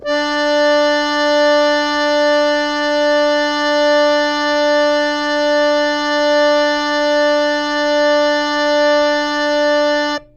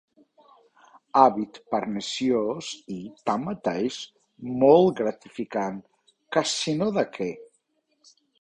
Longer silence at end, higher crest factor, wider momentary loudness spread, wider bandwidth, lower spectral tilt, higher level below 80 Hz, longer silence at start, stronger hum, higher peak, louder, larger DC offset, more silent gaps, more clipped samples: second, 0.15 s vs 0.95 s; second, 12 dB vs 24 dB; second, 3 LU vs 17 LU; second, 8.2 kHz vs 11 kHz; second, -2 dB/octave vs -5 dB/octave; first, -50 dBFS vs -66 dBFS; second, 0 s vs 1.15 s; neither; about the same, -4 dBFS vs -2 dBFS; first, -14 LUFS vs -25 LUFS; neither; neither; neither